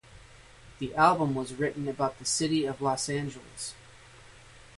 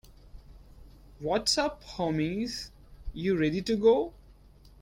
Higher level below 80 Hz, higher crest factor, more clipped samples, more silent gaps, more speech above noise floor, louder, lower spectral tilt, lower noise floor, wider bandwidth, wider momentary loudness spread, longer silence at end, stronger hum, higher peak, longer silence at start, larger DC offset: second, -58 dBFS vs -50 dBFS; about the same, 22 dB vs 20 dB; neither; neither; about the same, 24 dB vs 27 dB; about the same, -29 LUFS vs -29 LUFS; about the same, -4 dB/octave vs -4.5 dB/octave; about the same, -52 dBFS vs -55 dBFS; second, 11.5 kHz vs 16 kHz; about the same, 15 LU vs 15 LU; about the same, 0.2 s vs 0.15 s; neither; about the same, -8 dBFS vs -10 dBFS; about the same, 0.1 s vs 0.1 s; neither